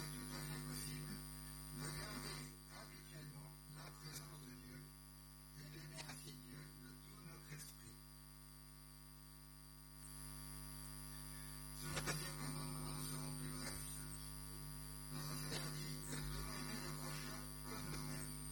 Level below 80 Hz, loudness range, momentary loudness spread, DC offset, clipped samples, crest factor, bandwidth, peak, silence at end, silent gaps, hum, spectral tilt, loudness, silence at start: -60 dBFS; 9 LU; 12 LU; under 0.1%; under 0.1%; 20 dB; 17.5 kHz; -30 dBFS; 0 s; none; 50 Hz at -55 dBFS; -3.5 dB/octave; -50 LUFS; 0 s